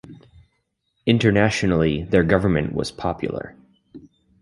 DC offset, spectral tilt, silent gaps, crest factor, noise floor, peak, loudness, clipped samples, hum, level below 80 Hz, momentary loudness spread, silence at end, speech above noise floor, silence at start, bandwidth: under 0.1%; -6.5 dB/octave; none; 20 dB; -72 dBFS; -2 dBFS; -20 LUFS; under 0.1%; none; -40 dBFS; 11 LU; 0.45 s; 52 dB; 0.1 s; 11.5 kHz